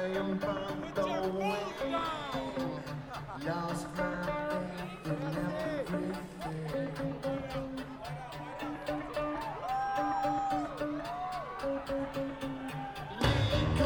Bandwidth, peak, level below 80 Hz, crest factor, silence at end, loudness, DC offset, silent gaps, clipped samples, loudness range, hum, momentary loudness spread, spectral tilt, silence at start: 17.5 kHz; -14 dBFS; -50 dBFS; 20 dB; 0 s; -36 LUFS; under 0.1%; none; under 0.1%; 3 LU; none; 9 LU; -6 dB/octave; 0 s